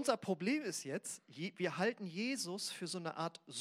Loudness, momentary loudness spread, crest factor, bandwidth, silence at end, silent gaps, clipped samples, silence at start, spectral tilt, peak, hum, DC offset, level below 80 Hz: -40 LUFS; 7 LU; 22 dB; 16 kHz; 0 s; none; under 0.1%; 0 s; -4 dB/octave; -18 dBFS; none; under 0.1%; under -90 dBFS